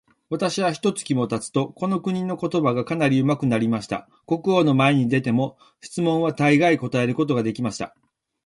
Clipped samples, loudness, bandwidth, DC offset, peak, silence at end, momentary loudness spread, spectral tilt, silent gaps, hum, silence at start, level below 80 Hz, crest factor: under 0.1%; -22 LUFS; 11.5 kHz; under 0.1%; -6 dBFS; 0.55 s; 10 LU; -6 dB/octave; none; none; 0.3 s; -60 dBFS; 16 dB